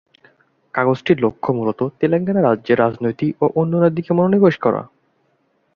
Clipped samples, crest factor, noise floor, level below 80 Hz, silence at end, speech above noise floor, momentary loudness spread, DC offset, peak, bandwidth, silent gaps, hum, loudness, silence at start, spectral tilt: under 0.1%; 16 dB; -64 dBFS; -58 dBFS; 0.9 s; 47 dB; 6 LU; under 0.1%; -2 dBFS; 6.8 kHz; none; none; -18 LUFS; 0.75 s; -9.5 dB/octave